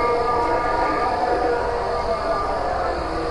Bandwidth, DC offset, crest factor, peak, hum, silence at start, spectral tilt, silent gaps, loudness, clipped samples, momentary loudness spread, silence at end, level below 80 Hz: 11.5 kHz; under 0.1%; 12 dB; -8 dBFS; none; 0 s; -5.5 dB/octave; none; -22 LUFS; under 0.1%; 3 LU; 0 s; -36 dBFS